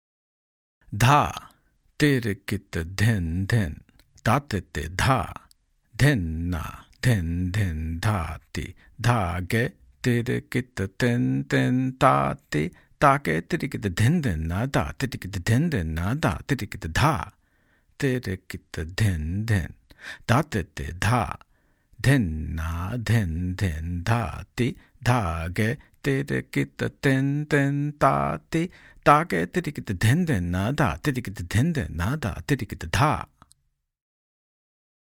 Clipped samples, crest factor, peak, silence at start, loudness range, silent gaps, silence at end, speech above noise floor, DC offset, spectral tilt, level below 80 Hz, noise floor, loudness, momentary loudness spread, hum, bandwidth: under 0.1%; 24 dB; -2 dBFS; 0.9 s; 4 LU; none; 1.75 s; 49 dB; under 0.1%; -6 dB/octave; -44 dBFS; -73 dBFS; -25 LUFS; 10 LU; none; 17 kHz